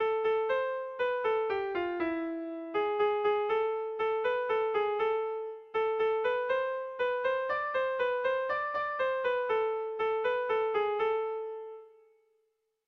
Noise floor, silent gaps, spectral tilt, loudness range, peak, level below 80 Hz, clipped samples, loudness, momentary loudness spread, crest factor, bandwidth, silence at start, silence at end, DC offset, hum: -77 dBFS; none; -5.5 dB/octave; 1 LU; -20 dBFS; -70 dBFS; under 0.1%; -31 LUFS; 6 LU; 12 dB; 6 kHz; 0 s; 1 s; under 0.1%; none